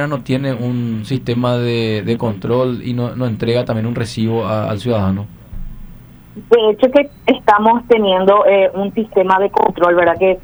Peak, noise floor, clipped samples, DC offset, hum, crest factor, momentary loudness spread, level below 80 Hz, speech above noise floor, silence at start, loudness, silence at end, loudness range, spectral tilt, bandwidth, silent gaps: 0 dBFS; -37 dBFS; under 0.1%; under 0.1%; none; 14 dB; 9 LU; -40 dBFS; 23 dB; 0 s; -15 LUFS; 0 s; 6 LU; -7.5 dB/octave; over 20 kHz; none